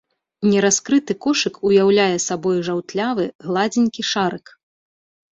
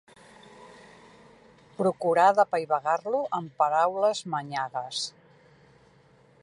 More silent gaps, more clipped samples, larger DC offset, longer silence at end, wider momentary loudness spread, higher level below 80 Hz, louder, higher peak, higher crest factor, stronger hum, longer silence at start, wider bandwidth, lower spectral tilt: first, 3.35-3.39 s vs none; neither; neither; second, 0.95 s vs 1.35 s; second, 7 LU vs 11 LU; first, -62 dBFS vs -76 dBFS; first, -19 LUFS vs -26 LUFS; first, -2 dBFS vs -8 dBFS; about the same, 16 dB vs 20 dB; neither; second, 0.4 s vs 0.6 s; second, 8 kHz vs 11.5 kHz; about the same, -4 dB/octave vs -4 dB/octave